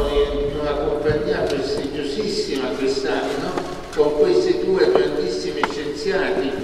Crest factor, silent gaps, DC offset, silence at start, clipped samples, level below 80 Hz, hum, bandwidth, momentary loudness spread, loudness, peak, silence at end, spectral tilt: 20 dB; none; under 0.1%; 0 s; under 0.1%; -36 dBFS; none; 13 kHz; 7 LU; -21 LUFS; 0 dBFS; 0 s; -5 dB/octave